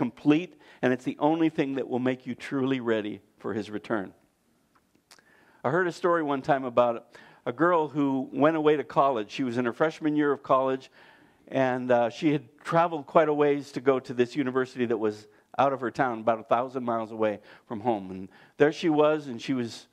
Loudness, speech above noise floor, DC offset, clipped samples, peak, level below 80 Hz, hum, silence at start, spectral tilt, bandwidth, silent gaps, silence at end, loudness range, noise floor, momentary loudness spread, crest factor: -27 LUFS; 42 dB; under 0.1%; under 0.1%; -6 dBFS; -74 dBFS; none; 0 s; -7 dB/octave; 10.5 kHz; none; 0.1 s; 5 LU; -68 dBFS; 10 LU; 22 dB